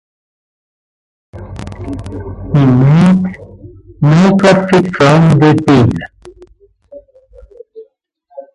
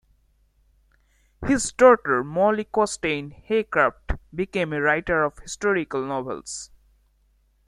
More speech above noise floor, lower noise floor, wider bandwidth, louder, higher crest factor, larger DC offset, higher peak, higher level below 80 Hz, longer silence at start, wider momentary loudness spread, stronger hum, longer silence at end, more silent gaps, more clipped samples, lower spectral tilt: first, 45 dB vs 41 dB; second, -53 dBFS vs -63 dBFS; about the same, 11 kHz vs 11.5 kHz; first, -9 LUFS vs -23 LUFS; second, 12 dB vs 22 dB; neither; about the same, 0 dBFS vs -2 dBFS; first, -36 dBFS vs -44 dBFS; about the same, 1.35 s vs 1.4 s; first, 19 LU vs 16 LU; neither; second, 0.15 s vs 1 s; neither; neither; first, -7.5 dB/octave vs -4.5 dB/octave